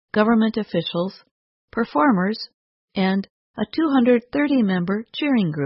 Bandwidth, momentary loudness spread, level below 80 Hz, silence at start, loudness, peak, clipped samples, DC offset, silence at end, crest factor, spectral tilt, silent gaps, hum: 5.8 kHz; 12 LU; -58 dBFS; 0.15 s; -21 LUFS; -4 dBFS; under 0.1%; under 0.1%; 0 s; 18 dB; -11 dB/octave; 1.31-1.68 s, 2.54-2.88 s, 3.30-3.54 s; none